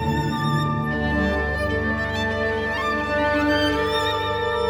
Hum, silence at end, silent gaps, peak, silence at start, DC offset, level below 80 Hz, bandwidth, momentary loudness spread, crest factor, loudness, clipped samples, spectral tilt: none; 0 s; none; -10 dBFS; 0 s; under 0.1%; -36 dBFS; over 20 kHz; 3 LU; 12 dB; -22 LUFS; under 0.1%; -6 dB/octave